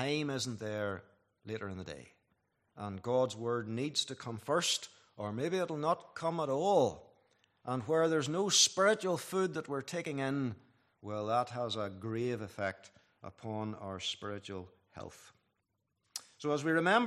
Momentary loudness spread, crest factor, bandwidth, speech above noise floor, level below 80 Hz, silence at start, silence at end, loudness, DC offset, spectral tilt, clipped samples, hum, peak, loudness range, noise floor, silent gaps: 18 LU; 22 dB; 14.5 kHz; 48 dB; -78 dBFS; 0 s; 0 s; -34 LUFS; under 0.1%; -3.5 dB/octave; under 0.1%; none; -12 dBFS; 10 LU; -83 dBFS; none